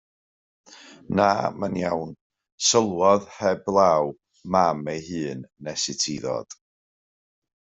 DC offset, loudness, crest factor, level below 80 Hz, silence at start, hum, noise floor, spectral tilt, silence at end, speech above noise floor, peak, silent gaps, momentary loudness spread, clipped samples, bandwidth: under 0.1%; -23 LUFS; 20 dB; -64 dBFS; 0.7 s; none; under -90 dBFS; -3.5 dB/octave; 1.25 s; over 67 dB; -4 dBFS; 2.21-2.30 s, 2.52-2.58 s; 13 LU; under 0.1%; 8.2 kHz